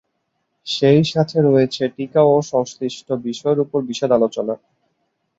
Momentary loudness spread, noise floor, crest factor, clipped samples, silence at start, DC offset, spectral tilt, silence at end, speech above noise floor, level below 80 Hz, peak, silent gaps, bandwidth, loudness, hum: 11 LU; -72 dBFS; 16 dB; under 0.1%; 0.65 s; under 0.1%; -6.5 dB/octave; 0.8 s; 54 dB; -60 dBFS; -2 dBFS; none; 8 kHz; -18 LUFS; none